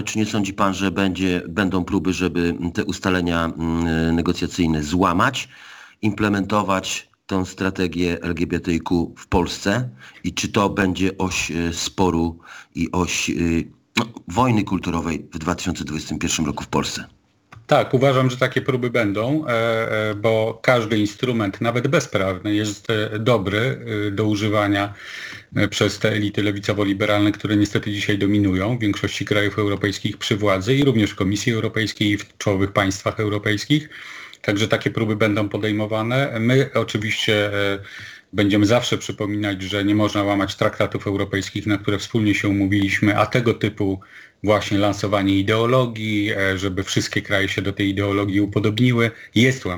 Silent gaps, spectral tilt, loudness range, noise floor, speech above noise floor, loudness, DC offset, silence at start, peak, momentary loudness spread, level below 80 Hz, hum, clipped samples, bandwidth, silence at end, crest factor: none; -5.5 dB/octave; 3 LU; -48 dBFS; 28 dB; -21 LUFS; under 0.1%; 0 s; 0 dBFS; 7 LU; -46 dBFS; none; under 0.1%; 19 kHz; 0 s; 20 dB